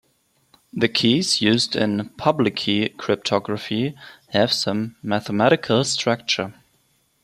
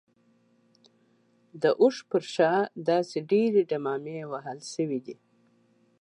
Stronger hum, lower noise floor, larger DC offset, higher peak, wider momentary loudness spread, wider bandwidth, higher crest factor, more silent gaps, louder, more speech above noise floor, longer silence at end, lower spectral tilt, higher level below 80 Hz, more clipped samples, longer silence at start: neither; about the same, -64 dBFS vs -66 dBFS; neither; first, -2 dBFS vs -10 dBFS; second, 8 LU vs 13 LU; first, 14 kHz vs 10.5 kHz; about the same, 20 dB vs 18 dB; neither; first, -21 LUFS vs -27 LUFS; first, 43 dB vs 39 dB; second, 0.7 s vs 0.9 s; about the same, -4.5 dB/octave vs -5.5 dB/octave; first, -62 dBFS vs -84 dBFS; neither; second, 0.75 s vs 1.55 s